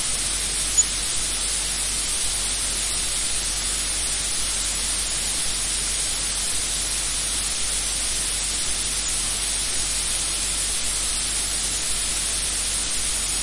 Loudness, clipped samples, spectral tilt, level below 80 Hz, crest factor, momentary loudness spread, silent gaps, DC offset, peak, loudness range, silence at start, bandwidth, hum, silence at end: -21 LUFS; under 0.1%; 0 dB/octave; -36 dBFS; 18 dB; 1 LU; none; 0.3%; -6 dBFS; 1 LU; 0 s; 11.5 kHz; none; 0 s